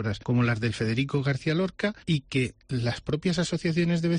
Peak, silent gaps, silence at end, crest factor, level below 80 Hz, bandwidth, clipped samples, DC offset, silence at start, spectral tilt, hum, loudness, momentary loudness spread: -14 dBFS; none; 0 s; 12 dB; -52 dBFS; 10 kHz; under 0.1%; under 0.1%; 0 s; -6.5 dB/octave; none; -27 LUFS; 4 LU